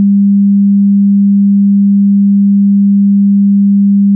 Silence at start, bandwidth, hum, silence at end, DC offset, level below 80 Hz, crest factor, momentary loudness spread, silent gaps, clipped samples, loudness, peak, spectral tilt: 0 s; 0.3 kHz; none; 0 s; under 0.1%; -74 dBFS; 4 dB; 0 LU; none; under 0.1%; -8 LUFS; -4 dBFS; -20 dB/octave